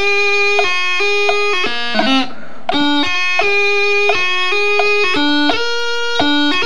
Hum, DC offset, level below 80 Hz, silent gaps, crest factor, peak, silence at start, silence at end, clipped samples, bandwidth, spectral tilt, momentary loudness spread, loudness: none; 10%; -58 dBFS; none; 16 dB; 0 dBFS; 0 s; 0 s; under 0.1%; 11.5 kHz; -2.5 dB/octave; 5 LU; -13 LUFS